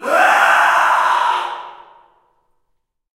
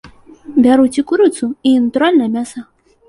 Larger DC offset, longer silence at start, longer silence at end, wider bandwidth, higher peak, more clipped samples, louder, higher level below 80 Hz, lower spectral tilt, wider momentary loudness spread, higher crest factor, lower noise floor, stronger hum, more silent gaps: neither; about the same, 0 s vs 0.05 s; first, 1.4 s vs 0.45 s; first, 16 kHz vs 11.5 kHz; about the same, 0 dBFS vs -2 dBFS; neither; about the same, -13 LUFS vs -13 LUFS; second, -68 dBFS vs -52 dBFS; second, 0 dB/octave vs -5 dB/octave; first, 13 LU vs 10 LU; about the same, 16 dB vs 12 dB; first, -68 dBFS vs -36 dBFS; neither; neither